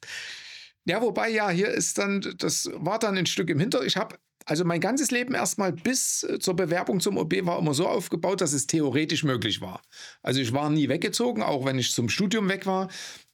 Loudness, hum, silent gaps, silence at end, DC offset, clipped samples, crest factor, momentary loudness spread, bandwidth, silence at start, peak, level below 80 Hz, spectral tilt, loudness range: -26 LUFS; none; none; 0.15 s; under 0.1%; under 0.1%; 16 dB; 10 LU; 19 kHz; 0 s; -10 dBFS; -72 dBFS; -4 dB/octave; 1 LU